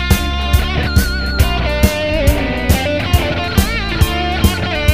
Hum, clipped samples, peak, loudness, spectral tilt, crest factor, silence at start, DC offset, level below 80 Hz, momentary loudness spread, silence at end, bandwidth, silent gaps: none; under 0.1%; 0 dBFS; -15 LUFS; -5 dB/octave; 14 dB; 0 s; 2%; -18 dBFS; 1 LU; 0 s; 16 kHz; none